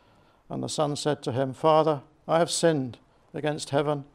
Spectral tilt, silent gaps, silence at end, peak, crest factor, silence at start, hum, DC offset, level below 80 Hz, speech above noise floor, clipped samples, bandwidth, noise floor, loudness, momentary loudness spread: -5 dB/octave; none; 0.1 s; -6 dBFS; 20 dB; 0.5 s; none; under 0.1%; -66 dBFS; 34 dB; under 0.1%; 15.5 kHz; -59 dBFS; -26 LUFS; 12 LU